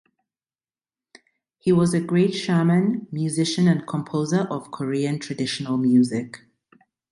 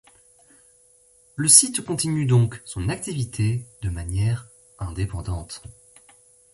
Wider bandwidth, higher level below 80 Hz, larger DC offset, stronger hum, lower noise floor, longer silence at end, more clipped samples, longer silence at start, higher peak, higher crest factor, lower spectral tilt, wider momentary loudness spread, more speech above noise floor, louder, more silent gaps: about the same, 11.5 kHz vs 12 kHz; second, -64 dBFS vs -42 dBFS; neither; neither; first, under -90 dBFS vs -57 dBFS; about the same, 0.75 s vs 0.8 s; neither; first, 1.65 s vs 1.35 s; second, -8 dBFS vs 0 dBFS; second, 16 dB vs 24 dB; first, -6.5 dB/octave vs -4 dB/octave; second, 8 LU vs 20 LU; first, over 69 dB vs 34 dB; about the same, -22 LUFS vs -21 LUFS; neither